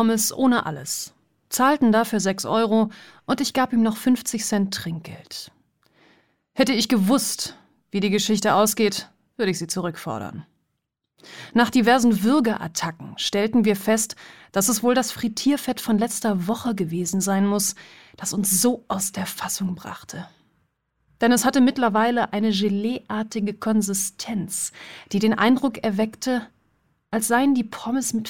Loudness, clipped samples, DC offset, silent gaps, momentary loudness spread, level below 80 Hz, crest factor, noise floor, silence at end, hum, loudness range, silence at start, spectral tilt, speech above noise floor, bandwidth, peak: -22 LUFS; under 0.1%; 0.2%; none; 12 LU; -62 dBFS; 18 dB; -78 dBFS; 0 s; none; 4 LU; 0 s; -4 dB/octave; 56 dB; 17.5 kHz; -6 dBFS